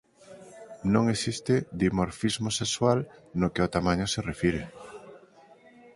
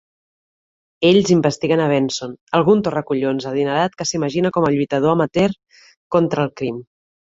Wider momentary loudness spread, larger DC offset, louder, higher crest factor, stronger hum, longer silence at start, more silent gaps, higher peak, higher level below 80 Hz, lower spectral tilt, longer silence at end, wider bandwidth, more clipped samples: first, 20 LU vs 8 LU; neither; second, -27 LUFS vs -18 LUFS; about the same, 20 dB vs 16 dB; neither; second, 0.3 s vs 1 s; second, none vs 2.41-2.47 s, 5.97-6.10 s; second, -8 dBFS vs -2 dBFS; first, -48 dBFS vs -54 dBFS; about the same, -5 dB/octave vs -5.5 dB/octave; first, 0.8 s vs 0.45 s; first, 11.5 kHz vs 8 kHz; neither